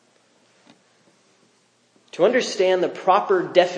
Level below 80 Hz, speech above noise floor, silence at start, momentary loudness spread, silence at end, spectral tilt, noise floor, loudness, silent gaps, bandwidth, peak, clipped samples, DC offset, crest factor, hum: -84 dBFS; 43 dB; 2.15 s; 3 LU; 0 s; -4 dB/octave; -61 dBFS; -20 LUFS; none; 9.6 kHz; -2 dBFS; under 0.1%; under 0.1%; 22 dB; none